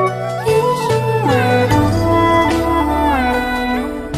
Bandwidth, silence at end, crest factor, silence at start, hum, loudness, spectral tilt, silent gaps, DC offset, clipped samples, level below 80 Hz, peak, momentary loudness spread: 15.5 kHz; 0 s; 12 dB; 0 s; none; -15 LUFS; -6.5 dB/octave; none; under 0.1%; under 0.1%; -30 dBFS; -2 dBFS; 5 LU